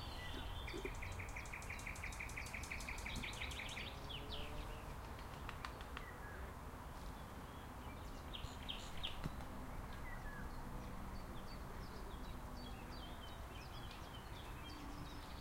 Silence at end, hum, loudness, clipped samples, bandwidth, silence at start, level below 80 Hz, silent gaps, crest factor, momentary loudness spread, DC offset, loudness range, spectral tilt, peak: 0 s; none; -50 LUFS; under 0.1%; 16 kHz; 0 s; -52 dBFS; none; 20 dB; 6 LU; under 0.1%; 5 LU; -4 dB/octave; -30 dBFS